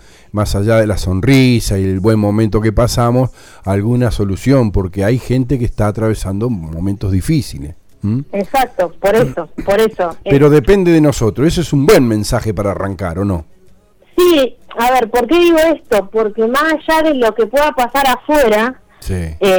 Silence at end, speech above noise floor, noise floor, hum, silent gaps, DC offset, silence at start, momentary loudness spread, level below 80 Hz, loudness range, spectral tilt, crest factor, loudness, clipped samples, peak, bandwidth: 0 s; 32 dB; -45 dBFS; none; none; under 0.1%; 0.35 s; 10 LU; -28 dBFS; 5 LU; -6.5 dB/octave; 12 dB; -13 LUFS; under 0.1%; 0 dBFS; over 20 kHz